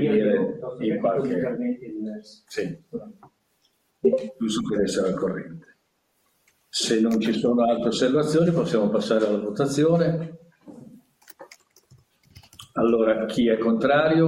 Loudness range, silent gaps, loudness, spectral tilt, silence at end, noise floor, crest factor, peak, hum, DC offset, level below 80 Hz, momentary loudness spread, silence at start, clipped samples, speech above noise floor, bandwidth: 7 LU; none; -23 LUFS; -6 dB/octave; 0 s; -70 dBFS; 16 dB; -8 dBFS; none; under 0.1%; -60 dBFS; 13 LU; 0 s; under 0.1%; 48 dB; 16.5 kHz